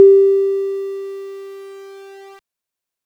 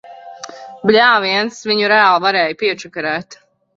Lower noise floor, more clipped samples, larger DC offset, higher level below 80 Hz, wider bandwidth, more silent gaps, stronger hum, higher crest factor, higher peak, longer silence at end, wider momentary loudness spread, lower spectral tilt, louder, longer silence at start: first, -85 dBFS vs -34 dBFS; neither; neither; second, -82 dBFS vs -60 dBFS; second, 5 kHz vs 7.8 kHz; neither; neither; about the same, 16 dB vs 16 dB; about the same, 0 dBFS vs 0 dBFS; first, 0.9 s vs 0.45 s; first, 25 LU vs 22 LU; first, -5.5 dB/octave vs -3.5 dB/octave; about the same, -16 LUFS vs -14 LUFS; about the same, 0 s vs 0.05 s